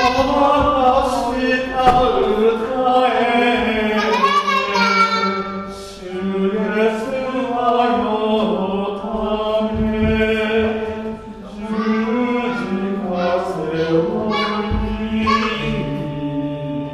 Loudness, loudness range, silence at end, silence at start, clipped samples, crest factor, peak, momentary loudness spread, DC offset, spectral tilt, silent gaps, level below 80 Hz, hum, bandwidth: -18 LUFS; 4 LU; 0 s; 0 s; under 0.1%; 16 dB; -2 dBFS; 9 LU; under 0.1%; -6 dB/octave; none; -36 dBFS; none; 13 kHz